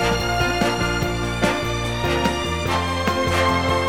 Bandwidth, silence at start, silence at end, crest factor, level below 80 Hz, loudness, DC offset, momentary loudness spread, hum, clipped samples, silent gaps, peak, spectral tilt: 17.5 kHz; 0 s; 0 s; 16 dB; -32 dBFS; -21 LUFS; 0.8%; 4 LU; none; under 0.1%; none; -4 dBFS; -4.5 dB/octave